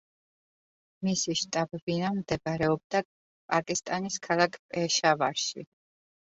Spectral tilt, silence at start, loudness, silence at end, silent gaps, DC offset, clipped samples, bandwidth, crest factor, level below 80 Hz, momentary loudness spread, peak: -3.5 dB/octave; 1 s; -29 LUFS; 0.75 s; 1.82-1.87 s, 2.84-2.90 s, 3.05-3.49 s, 4.59-4.69 s; under 0.1%; under 0.1%; 8 kHz; 22 dB; -64 dBFS; 7 LU; -8 dBFS